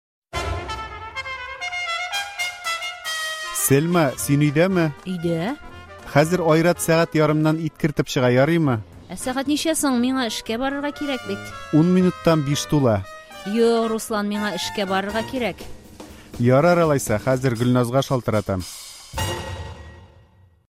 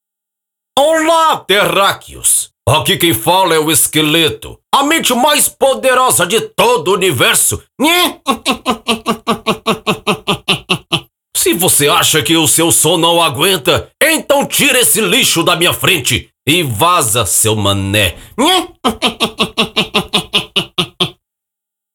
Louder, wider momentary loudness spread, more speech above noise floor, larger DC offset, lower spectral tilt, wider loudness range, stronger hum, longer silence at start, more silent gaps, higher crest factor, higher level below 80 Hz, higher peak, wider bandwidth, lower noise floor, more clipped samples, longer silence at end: second, -21 LUFS vs -11 LUFS; first, 14 LU vs 7 LU; second, 33 dB vs 68 dB; neither; first, -5.5 dB/octave vs -2.5 dB/octave; about the same, 4 LU vs 4 LU; neither; second, 0.35 s vs 0.75 s; neither; first, 18 dB vs 12 dB; about the same, -46 dBFS vs -44 dBFS; about the same, -2 dBFS vs 0 dBFS; second, 16 kHz vs over 20 kHz; second, -53 dBFS vs -81 dBFS; neither; second, 0.65 s vs 0.85 s